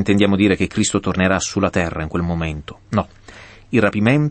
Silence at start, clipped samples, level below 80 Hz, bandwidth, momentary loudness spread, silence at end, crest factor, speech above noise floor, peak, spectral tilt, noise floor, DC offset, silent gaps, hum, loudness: 0 s; under 0.1%; -40 dBFS; 8.8 kHz; 8 LU; 0 s; 16 dB; 24 dB; -2 dBFS; -5.5 dB/octave; -41 dBFS; under 0.1%; none; none; -18 LUFS